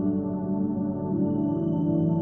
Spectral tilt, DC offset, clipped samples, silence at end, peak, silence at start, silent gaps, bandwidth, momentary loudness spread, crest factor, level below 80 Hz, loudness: -12.5 dB/octave; under 0.1%; under 0.1%; 0 s; -14 dBFS; 0 s; none; 3.2 kHz; 4 LU; 12 dB; -54 dBFS; -27 LUFS